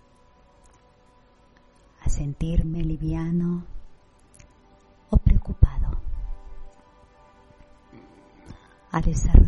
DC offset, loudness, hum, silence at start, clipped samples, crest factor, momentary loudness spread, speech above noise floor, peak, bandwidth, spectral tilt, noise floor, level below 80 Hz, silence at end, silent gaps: under 0.1%; -26 LUFS; none; 2.05 s; under 0.1%; 22 dB; 26 LU; 37 dB; -2 dBFS; 8.4 kHz; -8 dB/octave; -57 dBFS; -26 dBFS; 0 s; none